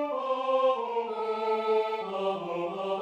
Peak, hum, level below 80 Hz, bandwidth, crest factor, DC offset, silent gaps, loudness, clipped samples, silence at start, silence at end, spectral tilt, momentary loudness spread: -16 dBFS; none; -80 dBFS; 8.8 kHz; 14 dB; under 0.1%; none; -29 LUFS; under 0.1%; 0 s; 0 s; -6 dB/octave; 6 LU